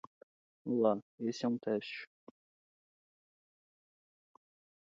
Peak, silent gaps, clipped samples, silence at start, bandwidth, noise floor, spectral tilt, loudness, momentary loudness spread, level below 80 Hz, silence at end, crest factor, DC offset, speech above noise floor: -18 dBFS; 1.02-1.18 s; under 0.1%; 0.65 s; 7.6 kHz; under -90 dBFS; -5 dB/octave; -36 LUFS; 15 LU; -86 dBFS; 2.8 s; 22 dB; under 0.1%; over 55 dB